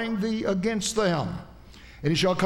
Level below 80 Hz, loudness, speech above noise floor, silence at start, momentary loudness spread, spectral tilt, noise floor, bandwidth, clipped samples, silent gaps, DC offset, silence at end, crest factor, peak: -50 dBFS; -26 LUFS; 22 dB; 0 s; 11 LU; -5 dB/octave; -47 dBFS; 16.5 kHz; under 0.1%; none; under 0.1%; 0 s; 16 dB; -10 dBFS